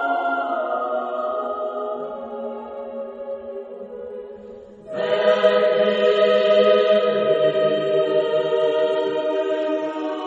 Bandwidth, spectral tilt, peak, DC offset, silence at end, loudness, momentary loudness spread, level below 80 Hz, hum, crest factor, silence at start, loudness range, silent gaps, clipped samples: 7.8 kHz; -5.5 dB/octave; -4 dBFS; under 0.1%; 0 s; -20 LUFS; 17 LU; -68 dBFS; none; 18 dB; 0 s; 13 LU; none; under 0.1%